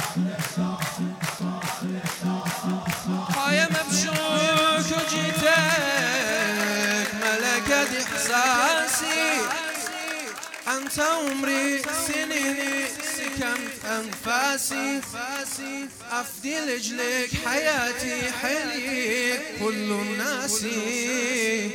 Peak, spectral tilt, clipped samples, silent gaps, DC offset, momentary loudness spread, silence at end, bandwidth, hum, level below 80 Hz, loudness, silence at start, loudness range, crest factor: -6 dBFS; -3 dB/octave; under 0.1%; none; under 0.1%; 9 LU; 0 s; 18 kHz; none; -58 dBFS; -24 LUFS; 0 s; 5 LU; 18 dB